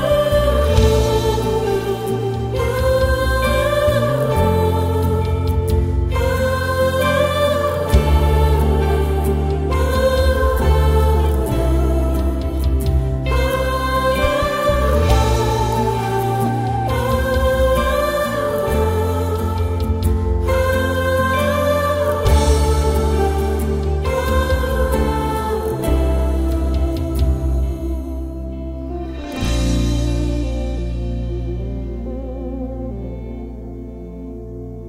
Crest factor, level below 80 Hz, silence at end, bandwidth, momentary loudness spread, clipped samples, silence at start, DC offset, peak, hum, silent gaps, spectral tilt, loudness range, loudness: 16 dB; -22 dBFS; 0 s; 16 kHz; 11 LU; under 0.1%; 0 s; under 0.1%; 0 dBFS; none; none; -6.5 dB/octave; 6 LU; -18 LUFS